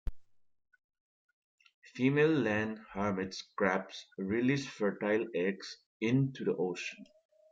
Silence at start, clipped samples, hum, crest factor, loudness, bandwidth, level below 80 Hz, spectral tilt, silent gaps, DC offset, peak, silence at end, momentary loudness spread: 0.05 s; under 0.1%; none; 20 dB; -33 LUFS; 7.8 kHz; -54 dBFS; -6.5 dB/octave; 0.84-0.89 s, 1.00-1.58 s, 1.74-1.82 s, 5.86-6.00 s; under 0.1%; -16 dBFS; 0.45 s; 15 LU